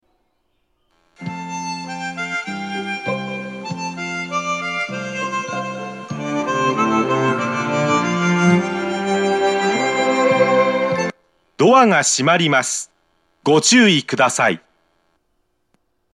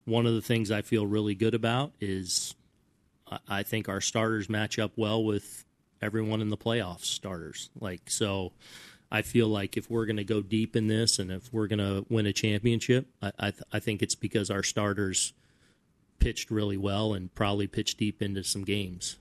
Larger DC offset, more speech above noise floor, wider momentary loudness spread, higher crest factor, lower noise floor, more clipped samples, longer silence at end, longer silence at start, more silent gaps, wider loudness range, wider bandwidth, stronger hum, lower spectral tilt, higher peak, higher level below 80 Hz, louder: neither; first, 54 dB vs 39 dB; first, 14 LU vs 8 LU; about the same, 18 dB vs 20 dB; about the same, -69 dBFS vs -69 dBFS; neither; first, 1.55 s vs 0.05 s; first, 1.2 s vs 0.05 s; neither; first, 10 LU vs 3 LU; about the same, 13 kHz vs 13.5 kHz; neither; about the same, -4 dB/octave vs -4.5 dB/octave; first, 0 dBFS vs -10 dBFS; second, -64 dBFS vs -48 dBFS; first, -18 LUFS vs -30 LUFS